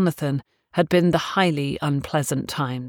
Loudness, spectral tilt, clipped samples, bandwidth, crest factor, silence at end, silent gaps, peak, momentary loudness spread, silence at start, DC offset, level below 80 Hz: -23 LUFS; -5.5 dB/octave; under 0.1%; 18.5 kHz; 18 dB; 0 s; none; -4 dBFS; 8 LU; 0 s; under 0.1%; -52 dBFS